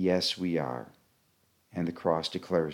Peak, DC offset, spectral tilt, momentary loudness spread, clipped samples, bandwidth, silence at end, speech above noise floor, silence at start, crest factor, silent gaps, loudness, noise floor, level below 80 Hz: -12 dBFS; under 0.1%; -5.5 dB/octave; 14 LU; under 0.1%; 16.5 kHz; 0 s; 40 dB; 0 s; 20 dB; none; -31 LUFS; -70 dBFS; -66 dBFS